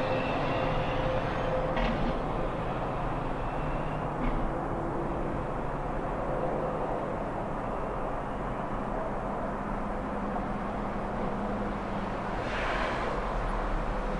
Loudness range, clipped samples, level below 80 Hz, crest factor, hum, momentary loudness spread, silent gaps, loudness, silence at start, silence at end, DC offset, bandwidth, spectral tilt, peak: 3 LU; under 0.1%; -38 dBFS; 16 dB; none; 4 LU; none; -32 LUFS; 0 s; 0 s; under 0.1%; 11 kHz; -7 dB/octave; -16 dBFS